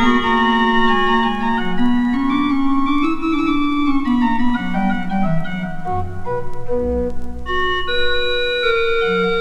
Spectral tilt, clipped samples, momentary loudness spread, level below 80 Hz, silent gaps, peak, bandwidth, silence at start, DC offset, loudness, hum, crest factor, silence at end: -6.5 dB/octave; under 0.1%; 10 LU; -30 dBFS; none; -2 dBFS; 7.8 kHz; 0 s; under 0.1%; -18 LUFS; none; 16 dB; 0 s